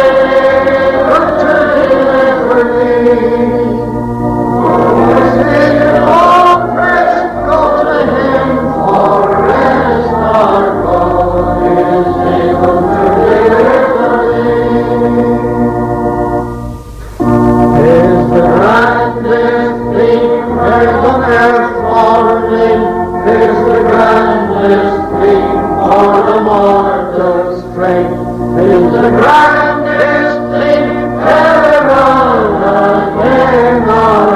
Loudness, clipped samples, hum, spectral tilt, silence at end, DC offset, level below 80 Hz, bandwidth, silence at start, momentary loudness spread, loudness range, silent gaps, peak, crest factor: -9 LUFS; 0.2%; none; -7.5 dB/octave; 0 s; under 0.1%; -30 dBFS; 14 kHz; 0 s; 6 LU; 2 LU; none; 0 dBFS; 8 dB